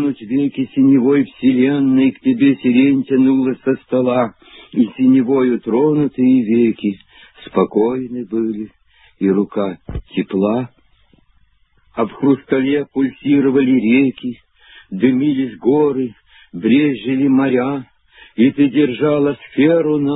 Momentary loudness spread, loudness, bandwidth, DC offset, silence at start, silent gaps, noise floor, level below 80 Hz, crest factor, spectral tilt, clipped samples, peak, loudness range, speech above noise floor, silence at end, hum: 10 LU; -16 LUFS; 4 kHz; under 0.1%; 0 s; none; -57 dBFS; -48 dBFS; 14 dB; -12.5 dB/octave; under 0.1%; 0 dBFS; 6 LU; 42 dB; 0 s; none